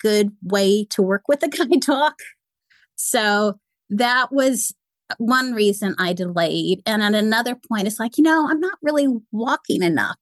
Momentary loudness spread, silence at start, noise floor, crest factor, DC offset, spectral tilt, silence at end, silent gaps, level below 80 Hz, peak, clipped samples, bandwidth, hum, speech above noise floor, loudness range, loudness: 7 LU; 0.05 s; -61 dBFS; 14 dB; under 0.1%; -4 dB/octave; 0.1 s; none; -74 dBFS; -6 dBFS; under 0.1%; 13 kHz; none; 42 dB; 1 LU; -20 LUFS